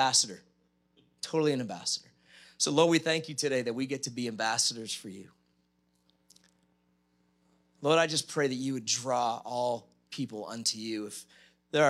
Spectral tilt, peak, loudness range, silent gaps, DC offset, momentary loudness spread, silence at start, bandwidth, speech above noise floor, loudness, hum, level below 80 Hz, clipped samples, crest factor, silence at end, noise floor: -3 dB/octave; -10 dBFS; 6 LU; none; under 0.1%; 14 LU; 0 s; 15 kHz; 42 dB; -30 LUFS; none; -82 dBFS; under 0.1%; 22 dB; 0 s; -73 dBFS